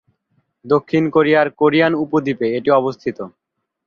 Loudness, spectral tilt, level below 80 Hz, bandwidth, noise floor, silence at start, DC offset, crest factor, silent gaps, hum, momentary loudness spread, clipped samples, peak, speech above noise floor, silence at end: -16 LUFS; -8 dB/octave; -60 dBFS; 6.8 kHz; -66 dBFS; 0.65 s; under 0.1%; 16 dB; none; none; 12 LU; under 0.1%; -2 dBFS; 50 dB; 0.55 s